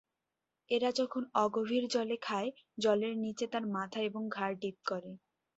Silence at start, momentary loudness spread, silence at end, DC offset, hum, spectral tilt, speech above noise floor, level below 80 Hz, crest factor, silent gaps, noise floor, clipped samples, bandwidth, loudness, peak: 0.7 s; 8 LU; 0.4 s; under 0.1%; none; -3.5 dB/octave; 54 dB; -80 dBFS; 20 dB; none; -88 dBFS; under 0.1%; 8 kHz; -35 LUFS; -16 dBFS